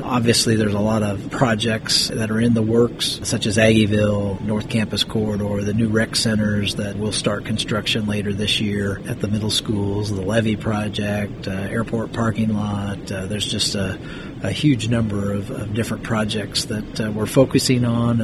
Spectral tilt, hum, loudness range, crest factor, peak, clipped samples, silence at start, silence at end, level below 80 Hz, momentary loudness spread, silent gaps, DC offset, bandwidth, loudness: -5 dB/octave; none; 4 LU; 18 dB; -2 dBFS; under 0.1%; 0 s; 0 s; -42 dBFS; 8 LU; none; under 0.1%; 13.5 kHz; -20 LUFS